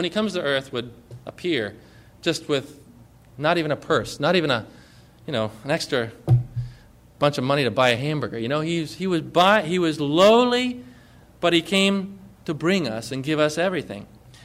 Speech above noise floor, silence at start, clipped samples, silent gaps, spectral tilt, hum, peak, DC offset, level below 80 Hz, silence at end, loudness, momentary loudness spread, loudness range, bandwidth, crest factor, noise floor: 28 dB; 0 s; under 0.1%; none; -5.5 dB/octave; none; -6 dBFS; under 0.1%; -54 dBFS; 0.4 s; -22 LUFS; 15 LU; 6 LU; 16 kHz; 18 dB; -49 dBFS